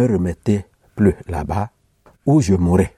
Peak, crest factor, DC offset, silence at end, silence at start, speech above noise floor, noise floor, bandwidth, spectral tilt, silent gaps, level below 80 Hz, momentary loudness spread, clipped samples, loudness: -2 dBFS; 16 dB; under 0.1%; 0.1 s; 0 s; 38 dB; -54 dBFS; 13 kHz; -8 dB/octave; none; -36 dBFS; 10 LU; under 0.1%; -19 LUFS